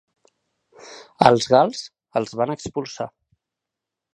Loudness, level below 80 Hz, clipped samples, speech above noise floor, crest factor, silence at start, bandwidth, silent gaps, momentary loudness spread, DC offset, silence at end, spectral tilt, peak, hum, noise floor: -20 LUFS; -58 dBFS; under 0.1%; 66 dB; 22 dB; 0.85 s; 11 kHz; none; 22 LU; under 0.1%; 1.05 s; -5 dB/octave; 0 dBFS; none; -85 dBFS